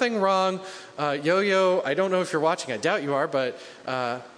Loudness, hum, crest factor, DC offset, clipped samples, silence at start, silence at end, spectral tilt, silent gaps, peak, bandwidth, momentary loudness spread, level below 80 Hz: -25 LUFS; none; 16 dB; under 0.1%; under 0.1%; 0 s; 0.05 s; -4.5 dB/octave; none; -8 dBFS; 10.5 kHz; 10 LU; -78 dBFS